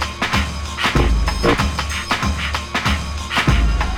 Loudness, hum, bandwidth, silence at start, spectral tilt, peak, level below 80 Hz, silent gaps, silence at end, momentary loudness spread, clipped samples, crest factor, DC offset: -19 LUFS; none; 16 kHz; 0 s; -4.5 dB/octave; -2 dBFS; -22 dBFS; none; 0 s; 5 LU; under 0.1%; 16 dB; under 0.1%